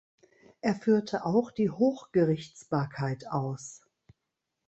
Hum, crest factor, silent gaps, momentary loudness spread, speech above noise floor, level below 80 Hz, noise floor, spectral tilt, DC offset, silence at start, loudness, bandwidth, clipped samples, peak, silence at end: none; 18 dB; none; 8 LU; 56 dB; -68 dBFS; -84 dBFS; -7 dB/octave; under 0.1%; 0.65 s; -29 LUFS; 8.4 kHz; under 0.1%; -12 dBFS; 0.9 s